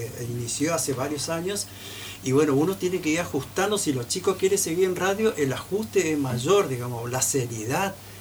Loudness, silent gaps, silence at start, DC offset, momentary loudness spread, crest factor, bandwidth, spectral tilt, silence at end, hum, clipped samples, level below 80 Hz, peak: -25 LUFS; none; 0 s; under 0.1%; 8 LU; 16 dB; over 20 kHz; -4 dB/octave; 0 s; none; under 0.1%; -56 dBFS; -8 dBFS